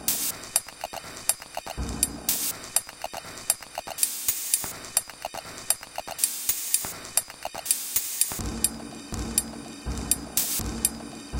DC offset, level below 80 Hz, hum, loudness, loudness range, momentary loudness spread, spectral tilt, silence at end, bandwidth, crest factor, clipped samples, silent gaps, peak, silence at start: under 0.1%; -44 dBFS; none; -27 LUFS; 2 LU; 13 LU; -1.5 dB/octave; 0 s; 17 kHz; 30 dB; under 0.1%; none; 0 dBFS; 0 s